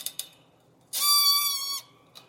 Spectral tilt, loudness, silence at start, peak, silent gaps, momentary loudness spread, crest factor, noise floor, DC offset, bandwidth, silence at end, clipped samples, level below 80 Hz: 3.5 dB/octave; -22 LUFS; 0 s; -10 dBFS; none; 16 LU; 18 dB; -61 dBFS; under 0.1%; 17 kHz; 0.45 s; under 0.1%; -82 dBFS